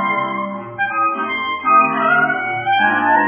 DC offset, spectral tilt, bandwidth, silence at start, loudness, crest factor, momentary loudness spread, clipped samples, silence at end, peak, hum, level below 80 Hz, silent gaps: under 0.1%; -7.5 dB/octave; 3.5 kHz; 0 s; -16 LUFS; 14 dB; 9 LU; under 0.1%; 0 s; -2 dBFS; none; -62 dBFS; none